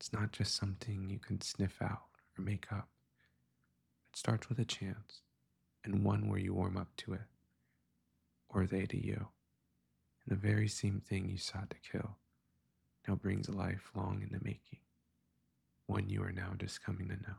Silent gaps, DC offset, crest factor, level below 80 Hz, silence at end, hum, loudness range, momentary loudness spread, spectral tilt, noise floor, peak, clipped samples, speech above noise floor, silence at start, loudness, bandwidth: none; under 0.1%; 20 dB; -64 dBFS; 0 s; none; 4 LU; 14 LU; -5.5 dB/octave; -80 dBFS; -20 dBFS; under 0.1%; 42 dB; 0 s; -40 LUFS; 12 kHz